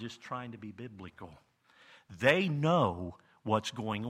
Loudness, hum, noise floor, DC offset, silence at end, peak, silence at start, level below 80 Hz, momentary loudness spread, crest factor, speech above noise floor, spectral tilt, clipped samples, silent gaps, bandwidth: -31 LUFS; none; -61 dBFS; under 0.1%; 0 s; -10 dBFS; 0 s; -66 dBFS; 21 LU; 24 dB; 28 dB; -6 dB/octave; under 0.1%; none; 13.5 kHz